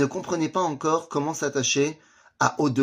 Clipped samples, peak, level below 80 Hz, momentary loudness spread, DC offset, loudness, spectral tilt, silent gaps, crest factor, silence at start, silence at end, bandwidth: under 0.1%; -4 dBFS; -66 dBFS; 5 LU; under 0.1%; -25 LUFS; -4 dB/octave; none; 20 dB; 0 s; 0 s; 15.5 kHz